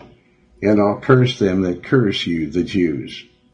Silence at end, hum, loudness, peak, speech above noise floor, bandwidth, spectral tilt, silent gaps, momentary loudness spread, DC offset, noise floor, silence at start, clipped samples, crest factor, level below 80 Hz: 0.3 s; none; -18 LUFS; 0 dBFS; 35 dB; 9.4 kHz; -7 dB/octave; none; 9 LU; under 0.1%; -52 dBFS; 0.6 s; under 0.1%; 18 dB; -50 dBFS